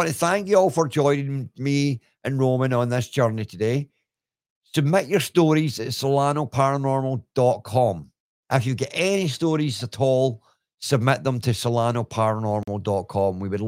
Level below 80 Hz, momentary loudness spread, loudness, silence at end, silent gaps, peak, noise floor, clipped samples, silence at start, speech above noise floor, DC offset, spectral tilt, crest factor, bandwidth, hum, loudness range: -62 dBFS; 7 LU; -23 LUFS; 0 s; 4.50-4.62 s, 8.20-8.43 s; -4 dBFS; -85 dBFS; under 0.1%; 0 s; 63 dB; under 0.1%; -6 dB/octave; 20 dB; 16.5 kHz; none; 2 LU